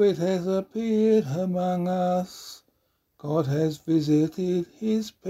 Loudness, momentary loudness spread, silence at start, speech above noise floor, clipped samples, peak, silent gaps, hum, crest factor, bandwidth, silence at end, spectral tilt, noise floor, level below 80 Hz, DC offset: -25 LUFS; 7 LU; 0 s; 47 dB; under 0.1%; -10 dBFS; none; none; 14 dB; 15.5 kHz; 0 s; -7.5 dB/octave; -72 dBFS; -64 dBFS; under 0.1%